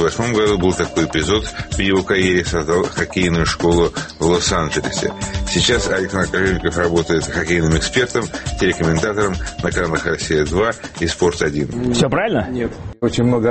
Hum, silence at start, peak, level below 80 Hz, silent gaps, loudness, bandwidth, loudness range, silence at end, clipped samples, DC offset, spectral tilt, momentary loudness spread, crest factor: none; 0 s; -2 dBFS; -32 dBFS; none; -18 LUFS; 8.8 kHz; 2 LU; 0 s; under 0.1%; under 0.1%; -4.5 dB/octave; 6 LU; 14 dB